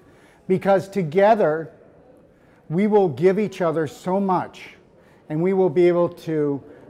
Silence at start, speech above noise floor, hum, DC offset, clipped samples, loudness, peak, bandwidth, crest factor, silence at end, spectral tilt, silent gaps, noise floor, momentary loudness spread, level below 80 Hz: 0.5 s; 33 dB; none; under 0.1%; under 0.1%; -21 LUFS; -6 dBFS; 12 kHz; 14 dB; 0.15 s; -8 dB/octave; none; -53 dBFS; 10 LU; -64 dBFS